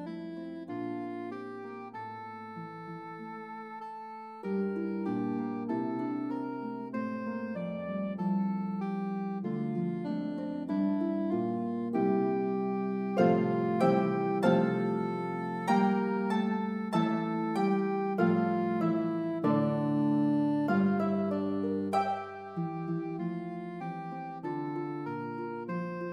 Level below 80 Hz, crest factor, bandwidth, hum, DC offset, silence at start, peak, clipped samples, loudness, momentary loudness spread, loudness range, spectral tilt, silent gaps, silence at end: -82 dBFS; 18 dB; 9.6 kHz; none; under 0.1%; 0 s; -14 dBFS; under 0.1%; -32 LUFS; 14 LU; 9 LU; -8.5 dB/octave; none; 0 s